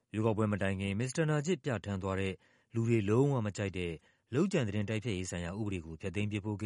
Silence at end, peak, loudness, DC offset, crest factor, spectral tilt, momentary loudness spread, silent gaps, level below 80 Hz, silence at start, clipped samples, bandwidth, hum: 0 s; -16 dBFS; -34 LUFS; under 0.1%; 18 dB; -6.5 dB/octave; 10 LU; none; -62 dBFS; 0.15 s; under 0.1%; 11.5 kHz; none